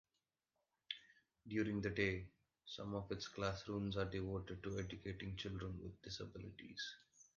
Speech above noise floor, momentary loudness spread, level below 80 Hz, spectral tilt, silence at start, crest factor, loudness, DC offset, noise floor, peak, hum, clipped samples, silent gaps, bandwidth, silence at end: over 45 dB; 12 LU; -62 dBFS; -5.5 dB/octave; 0.9 s; 22 dB; -46 LUFS; under 0.1%; under -90 dBFS; -24 dBFS; none; under 0.1%; none; 7.2 kHz; 0.15 s